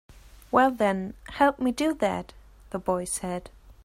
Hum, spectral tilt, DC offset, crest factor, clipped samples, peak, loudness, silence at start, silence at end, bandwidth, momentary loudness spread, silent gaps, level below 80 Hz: none; -4.5 dB/octave; under 0.1%; 20 dB; under 0.1%; -8 dBFS; -26 LUFS; 0.1 s; 0.15 s; 16 kHz; 14 LU; none; -52 dBFS